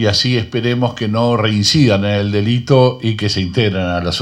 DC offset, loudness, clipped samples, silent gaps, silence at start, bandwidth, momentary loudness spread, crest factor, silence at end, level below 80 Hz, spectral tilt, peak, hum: under 0.1%; -15 LUFS; under 0.1%; none; 0 s; 12 kHz; 6 LU; 14 dB; 0 s; -46 dBFS; -5.5 dB/octave; 0 dBFS; none